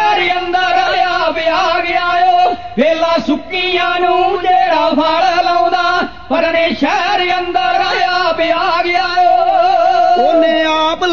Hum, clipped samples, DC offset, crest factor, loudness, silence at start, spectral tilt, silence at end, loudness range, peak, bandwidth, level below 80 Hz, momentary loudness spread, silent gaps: none; under 0.1%; 2%; 10 dB; -12 LUFS; 0 s; -3.5 dB/octave; 0 s; 2 LU; -2 dBFS; 7 kHz; -44 dBFS; 4 LU; none